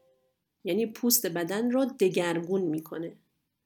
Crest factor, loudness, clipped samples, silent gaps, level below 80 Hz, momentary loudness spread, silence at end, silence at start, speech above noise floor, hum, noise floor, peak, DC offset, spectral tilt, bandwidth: 22 dB; -28 LUFS; under 0.1%; none; -78 dBFS; 14 LU; 0.55 s; 0.65 s; 47 dB; none; -75 dBFS; -8 dBFS; under 0.1%; -4 dB/octave; 19 kHz